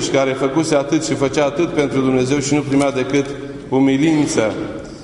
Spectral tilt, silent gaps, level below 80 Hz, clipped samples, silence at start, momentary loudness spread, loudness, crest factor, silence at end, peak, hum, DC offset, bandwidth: -5 dB/octave; none; -46 dBFS; under 0.1%; 0 s; 6 LU; -17 LUFS; 16 dB; 0 s; -2 dBFS; none; under 0.1%; 11 kHz